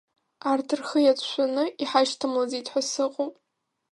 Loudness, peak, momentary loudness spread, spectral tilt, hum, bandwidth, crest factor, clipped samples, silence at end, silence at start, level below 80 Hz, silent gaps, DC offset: -26 LUFS; -8 dBFS; 6 LU; -2 dB/octave; none; 11.5 kHz; 18 dB; under 0.1%; 0.6 s; 0.45 s; -80 dBFS; none; under 0.1%